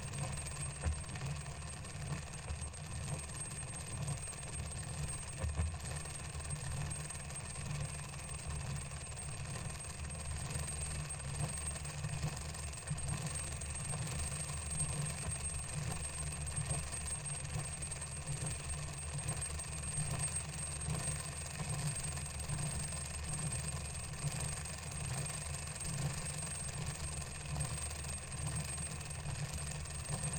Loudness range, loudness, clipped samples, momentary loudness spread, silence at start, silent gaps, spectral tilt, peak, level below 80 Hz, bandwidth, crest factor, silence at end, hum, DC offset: 3 LU; -41 LUFS; under 0.1%; 5 LU; 0 s; none; -3.5 dB/octave; -24 dBFS; -48 dBFS; 17 kHz; 16 dB; 0 s; none; under 0.1%